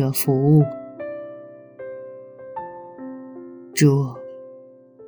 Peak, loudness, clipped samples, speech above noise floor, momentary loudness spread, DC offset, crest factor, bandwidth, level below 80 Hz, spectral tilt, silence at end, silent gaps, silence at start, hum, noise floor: -4 dBFS; -20 LUFS; under 0.1%; 28 dB; 23 LU; under 0.1%; 18 dB; over 20 kHz; -66 dBFS; -6.5 dB/octave; 0 s; none; 0 s; none; -45 dBFS